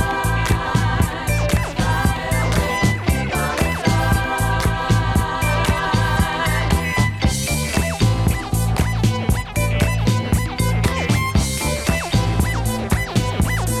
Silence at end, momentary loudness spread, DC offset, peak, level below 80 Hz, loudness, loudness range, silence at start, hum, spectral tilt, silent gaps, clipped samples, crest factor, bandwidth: 0 s; 3 LU; under 0.1%; -4 dBFS; -26 dBFS; -19 LUFS; 1 LU; 0 s; none; -5 dB/octave; none; under 0.1%; 14 dB; 15.5 kHz